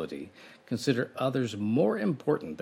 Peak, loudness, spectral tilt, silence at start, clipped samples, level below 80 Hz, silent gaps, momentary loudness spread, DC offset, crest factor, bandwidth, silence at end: -12 dBFS; -29 LUFS; -6.5 dB/octave; 0 s; under 0.1%; -72 dBFS; none; 12 LU; under 0.1%; 18 dB; 16 kHz; 0 s